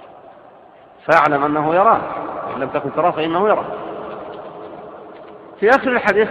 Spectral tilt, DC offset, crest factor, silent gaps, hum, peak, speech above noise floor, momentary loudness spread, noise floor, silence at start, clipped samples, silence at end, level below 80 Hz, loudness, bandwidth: -6.5 dB/octave; under 0.1%; 18 dB; none; none; 0 dBFS; 29 dB; 21 LU; -44 dBFS; 0 s; under 0.1%; 0 s; -56 dBFS; -17 LUFS; 9.2 kHz